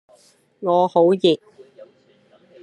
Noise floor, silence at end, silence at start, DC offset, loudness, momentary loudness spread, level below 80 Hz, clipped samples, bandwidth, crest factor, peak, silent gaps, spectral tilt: -56 dBFS; 0.8 s; 0.6 s; under 0.1%; -18 LUFS; 10 LU; -72 dBFS; under 0.1%; 10 kHz; 18 dB; -4 dBFS; none; -7 dB/octave